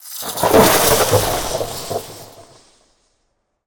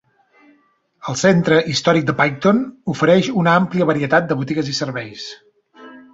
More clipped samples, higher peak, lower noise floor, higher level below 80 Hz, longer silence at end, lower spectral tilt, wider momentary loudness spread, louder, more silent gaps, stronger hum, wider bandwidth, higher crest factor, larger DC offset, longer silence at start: neither; about the same, 0 dBFS vs -2 dBFS; first, -68 dBFS vs -59 dBFS; first, -40 dBFS vs -56 dBFS; first, 1.25 s vs 0.15 s; second, -3 dB/octave vs -5.5 dB/octave; first, 16 LU vs 12 LU; about the same, -15 LUFS vs -17 LUFS; neither; neither; first, over 20 kHz vs 7.8 kHz; about the same, 18 dB vs 16 dB; neither; second, 0.05 s vs 1.05 s